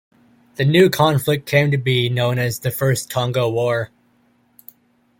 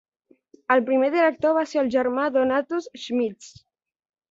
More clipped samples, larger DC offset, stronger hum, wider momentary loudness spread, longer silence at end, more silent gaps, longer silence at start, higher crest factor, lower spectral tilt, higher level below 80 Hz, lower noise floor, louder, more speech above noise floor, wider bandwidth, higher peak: neither; neither; neither; about the same, 8 LU vs 10 LU; first, 1.35 s vs 0.8 s; neither; about the same, 0.6 s vs 0.7 s; about the same, 16 dB vs 18 dB; about the same, -5.5 dB/octave vs -4.5 dB/octave; first, -54 dBFS vs -66 dBFS; about the same, -59 dBFS vs -56 dBFS; first, -18 LUFS vs -22 LUFS; first, 42 dB vs 34 dB; first, 17 kHz vs 7.8 kHz; first, -2 dBFS vs -6 dBFS